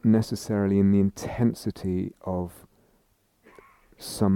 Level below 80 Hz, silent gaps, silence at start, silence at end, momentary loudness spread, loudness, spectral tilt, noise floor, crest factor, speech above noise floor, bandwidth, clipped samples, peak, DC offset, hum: -54 dBFS; none; 0.05 s; 0 s; 12 LU; -26 LUFS; -7.5 dB/octave; -66 dBFS; 16 dB; 42 dB; 16 kHz; under 0.1%; -10 dBFS; under 0.1%; none